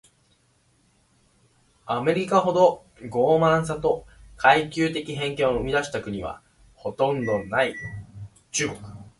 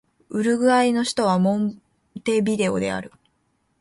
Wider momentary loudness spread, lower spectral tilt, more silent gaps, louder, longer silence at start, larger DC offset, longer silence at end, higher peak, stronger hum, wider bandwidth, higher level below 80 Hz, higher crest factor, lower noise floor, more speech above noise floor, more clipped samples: first, 17 LU vs 11 LU; about the same, -4.5 dB/octave vs -5.5 dB/octave; neither; about the same, -23 LUFS vs -21 LUFS; first, 1.85 s vs 0.3 s; neither; second, 0.1 s vs 0.75 s; about the same, -4 dBFS vs -6 dBFS; neither; about the same, 11.5 kHz vs 11.5 kHz; first, -50 dBFS vs -60 dBFS; first, 22 dB vs 16 dB; second, -64 dBFS vs -68 dBFS; second, 41 dB vs 48 dB; neither